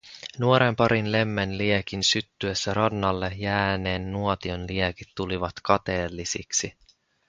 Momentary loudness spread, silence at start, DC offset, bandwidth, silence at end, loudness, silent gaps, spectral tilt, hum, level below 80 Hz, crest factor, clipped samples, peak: 8 LU; 0.05 s; under 0.1%; 9.6 kHz; 0.6 s; -25 LUFS; none; -4 dB/octave; none; -46 dBFS; 22 dB; under 0.1%; -4 dBFS